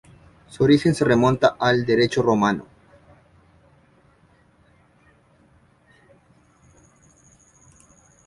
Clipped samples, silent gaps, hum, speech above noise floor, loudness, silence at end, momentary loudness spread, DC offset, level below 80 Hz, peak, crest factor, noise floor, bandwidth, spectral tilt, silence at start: under 0.1%; none; none; 39 dB; -19 LUFS; 5.65 s; 5 LU; under 0.1%; -54 dBFS; -2 dBFS; 22 dB; -57 dBFS; 11.5 kHz; -6 dB/octave; 0.6 s